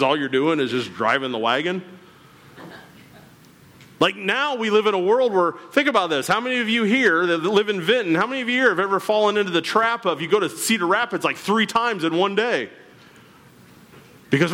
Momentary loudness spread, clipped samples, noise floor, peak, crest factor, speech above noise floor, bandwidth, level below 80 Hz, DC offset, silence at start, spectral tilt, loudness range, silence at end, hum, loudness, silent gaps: 5 LU; under 0.1%; -49 dBFS; -6 dBFS; 16 dB; 29 dB; 16.5 kHz; -68 dBFS; under 0.1%; 0 s; -4 dB/octave; 6 LU; 0 s; none; -20 LUFS; none